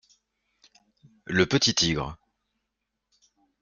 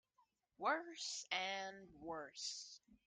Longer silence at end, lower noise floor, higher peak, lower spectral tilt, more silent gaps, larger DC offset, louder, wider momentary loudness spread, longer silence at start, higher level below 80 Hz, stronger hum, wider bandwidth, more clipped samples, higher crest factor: first, 1.45 s vs 0.1 s; about the same, -82 dBFS vs -80 dBFS; first, -8 dBFS vs -24 dBFS; first, -3.5 dB/octave vs -1 dB/octave; neither; neither; first, -24 LUFS vs -44 LUFS; first, 16 LU vs 11 LU; first, 1.3 s vs 0.6 s; first, -54 dBFS vs -82 dBFS; neither; about the same, 10 kHz vs 11 kHz; neither; about the same, 22 dB vs 24 dB